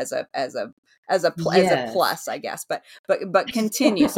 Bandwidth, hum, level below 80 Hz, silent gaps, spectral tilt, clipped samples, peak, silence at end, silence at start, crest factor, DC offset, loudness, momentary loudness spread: 17 kHz; none; -62 dBFS; 0.73-0.83 s, 0.98-1.03 s, 2.99-3.04 s; -4.5 dB/octave; under 0.1%; -4 dBFS; 0 s; 0 s; 20 dB; under 0.1%; -23 LUFS; 12 LU